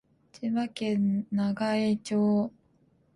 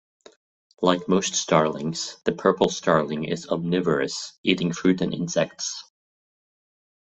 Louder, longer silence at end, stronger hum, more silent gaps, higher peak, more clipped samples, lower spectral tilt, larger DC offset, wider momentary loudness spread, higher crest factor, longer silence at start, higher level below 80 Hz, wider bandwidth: second, -28 LUFS vs -24 LUFS; second, 0.65 s vs 1.25 s; neither; second, none vs 4.38-4.44 s; second, -18 dBFS vs -2 dBFS; neither; first, -7 dB/octave vs -4.5 dB/octave; neither; second, 5 LU vs 8 LU; second, 12 dB vs 22 dB; second, 0.35 s vs 0.8 s; second, -68 dBFS vs -60 dBFS; first, 11.5 kHz vs 8.4 kHz